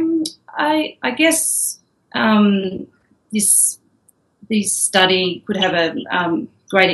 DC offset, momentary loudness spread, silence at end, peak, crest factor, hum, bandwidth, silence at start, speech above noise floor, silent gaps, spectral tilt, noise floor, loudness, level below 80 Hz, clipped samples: under 0.1%; 12 LU; 0 s; 0 dBFS; 18 dB; none; 14 kHz; 0 s; 42 dB; none; -2.5 dB/octave; -59 dBFS; -17 LUFS; -62 dBFS; under 0.1%